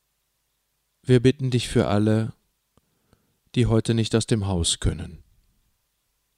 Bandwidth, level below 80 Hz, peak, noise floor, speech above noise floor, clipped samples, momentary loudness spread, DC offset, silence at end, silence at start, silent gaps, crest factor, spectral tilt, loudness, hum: 12.5 kHz; -40 dBFS; -6 dBFS; -73 dBFS; 52 dB; under 0.1%; 13 LU; under 0.1%; 1.2 s; 1.1 s; none; 20 dB; -5.5 dB/octave; -22 LUFS; none